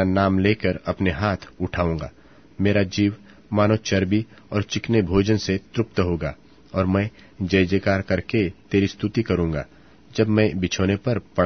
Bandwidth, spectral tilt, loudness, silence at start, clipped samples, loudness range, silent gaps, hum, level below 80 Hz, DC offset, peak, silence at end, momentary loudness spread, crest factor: 6.6 kHz; -6.5 dB/octave; -23 LUFS; 0 s; under 0.1%; 1 LU; none; none; -44 dBFS; 0.2%; -4 dBFS; 0 s; 9 LU; 18 dB